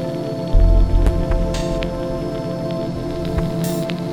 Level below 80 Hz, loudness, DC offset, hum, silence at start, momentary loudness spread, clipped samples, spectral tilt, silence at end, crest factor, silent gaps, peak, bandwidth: -20 dBFS; -21 LUFS; 0.5%; none; 0 s; 7 LU; under 0.1%; -7 dB/octave; 0 s; 14 dB; none; -4 dBFS; 16.5 kHz